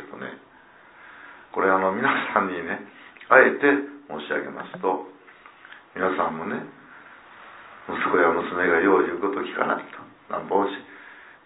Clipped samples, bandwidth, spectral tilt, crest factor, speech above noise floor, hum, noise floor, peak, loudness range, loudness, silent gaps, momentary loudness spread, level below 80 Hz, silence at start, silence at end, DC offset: under 0.1%; 4 kHz; -9 dB/octave; 24 dB; 29 dB; none; -52 dBFS; -2 dBFS; 8 LU; -23 LUFS; none; 25 LU; -68 dBFS; 0 s; 0.15 s; under 0.1%